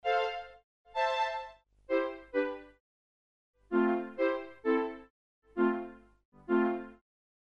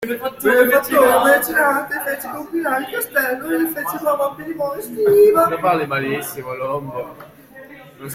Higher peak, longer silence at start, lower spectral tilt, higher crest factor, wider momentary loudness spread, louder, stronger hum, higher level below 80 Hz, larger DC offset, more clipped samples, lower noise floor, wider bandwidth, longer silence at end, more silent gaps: second, -18 dBFS vs -2 dBFS; about the same, 0.05 s vs 0 s; first, -6 dB/octave vs -4 dB/octave; about the same, 16 dB vs 16 dB; first, 17 LU vs 13 LU; second, -33 LUFS vs -17 LUFS; first, 50 Hz at -75 dBFS vs none; second, -68 dBFS vs -56 dBFS; neither; neither; first, under -90 dBFS vs -41 dBFS; second, 7.4 kHz vs 16.5 kHz; first, 0.5 s vs 0 s; first, 0.63-0.85 s, 2.80-3.54 s, 5.10-5.42 s, 6.25-6.32 s vs none